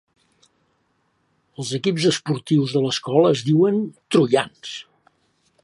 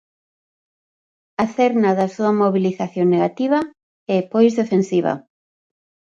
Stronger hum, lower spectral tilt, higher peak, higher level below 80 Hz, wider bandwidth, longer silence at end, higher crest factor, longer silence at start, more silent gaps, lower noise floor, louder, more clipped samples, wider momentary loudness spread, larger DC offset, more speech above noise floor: neither; second, -5.5 dB/octave vs -7.5 dB/octave; about the same, -4 dBFS vs -4 dBFS; about the same, -68 dBFS vs -66 dBFS; first, 11.5 kHz vs 7.8 kHz; about the same, 0.8 s vs 0.9 s; about the same, 18 dB vs 16 dB; first, 1.6 s vs 1.4 s; second, none vs 3.83-4.06 s; second, -67 dBFS vs under -90 dBFS; about the same, -20 LUFS vs -18 LUFS; neither; first, 14 LU vs 8 LU; neither; second, 48 dB vs over 73 dB